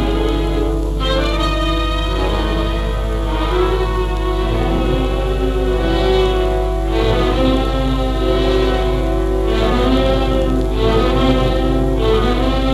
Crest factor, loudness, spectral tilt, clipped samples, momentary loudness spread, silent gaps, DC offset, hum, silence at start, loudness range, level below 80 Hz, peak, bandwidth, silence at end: 14 dB; -17 LUFS; -6.5 dB/octave; under 0.1%; 4 LU; none; under 0.1%; 50 Hz at -20 dBFS; 0 s; 3 LU; -18 dBFS; -2 dBFS; 12.5 kHz; 0 s